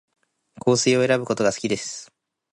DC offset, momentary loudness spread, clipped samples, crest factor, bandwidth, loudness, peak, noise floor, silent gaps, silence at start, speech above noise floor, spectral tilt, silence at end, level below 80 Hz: under 0.1%; 11 LU; under 0.1%; 16 dB; 11.5 kHz; -21 LUFS; -6 dBFS; -44 dBFS; none; 0.65 s; 23 dB; -4 dB/octave; 0.5 s; -62 dBFS